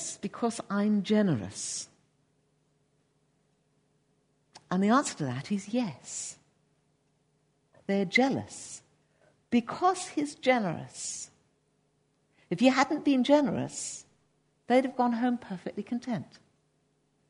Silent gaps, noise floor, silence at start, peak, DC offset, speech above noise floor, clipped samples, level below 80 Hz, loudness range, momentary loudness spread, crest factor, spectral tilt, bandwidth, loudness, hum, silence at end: none; -72 dBFS; 0 s; -10 dBFS; under 0.1%; 44 dB; under 0.1%; -74 dBFS; 6 LU; 13 LU; 22 dB; -4.5 dB/octave; 11 kHz; -29 LUFS; none; 1.05 s